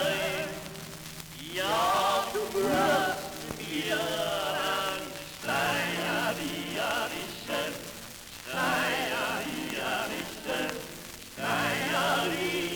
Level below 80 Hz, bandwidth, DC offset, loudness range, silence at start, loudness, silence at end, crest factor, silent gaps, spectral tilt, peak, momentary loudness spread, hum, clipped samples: -58 dBFS; over 20 kHz; under 0.1%; 3 LU; 0 s; -30 LUFS; 0 s; 18 dB; none; -3 dB/octave; -12 dBFS; 14 LU; none; under 0.1%